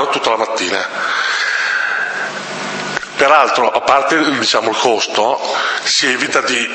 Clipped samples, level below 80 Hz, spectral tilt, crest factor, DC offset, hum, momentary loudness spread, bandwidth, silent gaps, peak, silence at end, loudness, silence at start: under 0.1%; -58 dBFS; -1.5 dB/octave; 16 dB; under 0.1%; none; 9 LU; 9.2 kHz; none; 0 dBFS; 0 s; -14 LUFS; 0 s